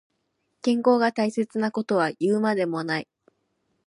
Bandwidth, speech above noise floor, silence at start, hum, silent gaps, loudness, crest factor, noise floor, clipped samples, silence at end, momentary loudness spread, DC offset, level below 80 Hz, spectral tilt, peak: 11 kHz; 51 dB; 0.65 s; none; none; -24 LUFS; 18 dB; -75 dBFS; under 0.1%; 0.85 s; 8 LU; under 0.1%; -76 dBFS; -6 dB/octave; -8 dBFS